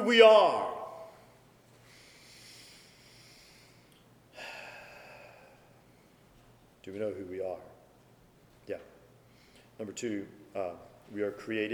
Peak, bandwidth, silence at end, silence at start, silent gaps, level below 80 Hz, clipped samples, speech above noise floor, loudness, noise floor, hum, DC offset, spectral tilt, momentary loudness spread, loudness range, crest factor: -6 dBFS; 15.5 kHz; 0 s; 0 s; none; -72 dBFS; under 0.1%; 34 dB; -29 LUFS; -61 dBFS; none; under 0.1%; -3.5 dB/octave; 28 LU; 13 LU; 26 dB